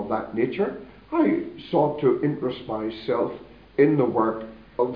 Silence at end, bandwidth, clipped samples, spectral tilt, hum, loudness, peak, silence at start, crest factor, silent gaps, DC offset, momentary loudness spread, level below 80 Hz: 0 s; 5.2 kHz; under 0.1%; -10.5 dB/octave; none; -24 LUFS; -6 dBFS; 0 s; 18 dB; none; under 0.1%; 11 LU; -56 dBFS